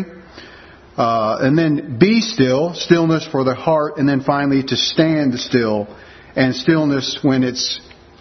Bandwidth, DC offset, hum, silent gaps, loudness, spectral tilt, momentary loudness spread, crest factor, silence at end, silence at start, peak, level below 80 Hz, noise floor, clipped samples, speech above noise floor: 6.4 kHz; under 0.1%; none; none; -17 LUFS; -5.5 dB/octave; 6 LU; 16 dB; 0.4 s; 0 s; 0 dBFS; -52 dBFS; -41 dBFS; under 0.1%; 25 dB